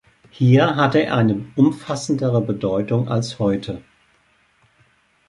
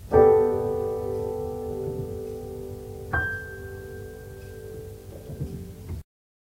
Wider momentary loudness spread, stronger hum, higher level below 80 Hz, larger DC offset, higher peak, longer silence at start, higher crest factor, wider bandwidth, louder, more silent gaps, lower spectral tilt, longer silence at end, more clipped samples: second, 9 LU vs 19 LU; neither; second, -52 dBFS vs -44 dBFS; neither; about the same, -4 dBFS vs -4 dBFS; first, 0.4 s vs 0 s; second, 16 dB vs 22 dB; second, 11.5 kHz vs 16 kHz; first, -19 LUFS vs -27 LUFS; neither; about the same, -7 dB/octave vs -7.5 dB/octave; first, 1.5 s vs 0.4 s; neither